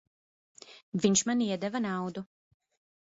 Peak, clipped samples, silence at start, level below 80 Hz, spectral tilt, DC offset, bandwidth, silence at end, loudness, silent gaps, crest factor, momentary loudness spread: -12 dBFS; under 0.1%; 0.7 s; -70 dBFS; -4 dB/octave; under 0.1%; 8 kHz; 0.8 s; -30 LUFS; 0.83-0.92 s; 22 dB; 15 LU